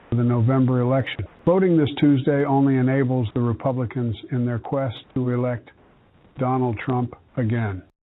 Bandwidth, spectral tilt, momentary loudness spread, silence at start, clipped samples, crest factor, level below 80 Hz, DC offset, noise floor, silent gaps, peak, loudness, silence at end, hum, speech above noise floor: 4.1 kHz; -11.5 dB/octave; 9 LU; 0.1 s; under 0.1%; 14 dB; -54 dBFS; under 0.1%; -54 dBFS; none; -6 dBFS; -22 LUFS; 0.25 s; none; 33 dB